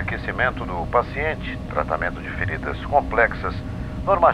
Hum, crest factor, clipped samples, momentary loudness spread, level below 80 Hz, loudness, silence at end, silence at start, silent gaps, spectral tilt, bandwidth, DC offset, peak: none; 20 dB; under 0.1%; 8 LU; -34 dBFS; -23 LUFS; 0 s; 0 s; none; -7.5 dB/octave; 11.5 kHz; under 0.1%; -4 dBFS